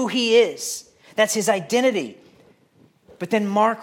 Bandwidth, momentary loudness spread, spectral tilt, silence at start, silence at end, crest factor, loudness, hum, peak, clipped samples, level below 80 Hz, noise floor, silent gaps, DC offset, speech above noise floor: 17 kHz; 14 LU; -3 dB/octave; 0 s; 0 s; 18 dB; -20 LUFS; none; -4 dBFS; under 0.1%; -74 dBFS; -57 dBFS; none; under 0.1%; 37 dB